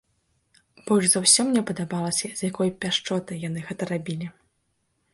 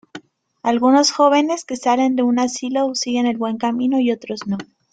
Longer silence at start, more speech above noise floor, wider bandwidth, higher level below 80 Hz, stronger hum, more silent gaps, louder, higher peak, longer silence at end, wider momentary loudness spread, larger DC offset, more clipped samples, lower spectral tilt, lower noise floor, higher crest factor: first, 0.85 s vs 0.15 s; first, 48 dB vs 23 dB; first, 12 kHz vs 9.2 kHz; about the same, -64 dBFS vs -64 dBFS; neither; neither; second, -23 LUFS vs -18 LUFS; about the same, -4 dBFS vs -2 dBFS; first, 0.85 s vs 0.3 s; first, 15 LU vs 11 LU; neither; neither; about the same, -3 dB/octave vs -3.5 dB/octave; first, -72 dBFS vs -41 dBFS; first, 22 dB vs 16 dB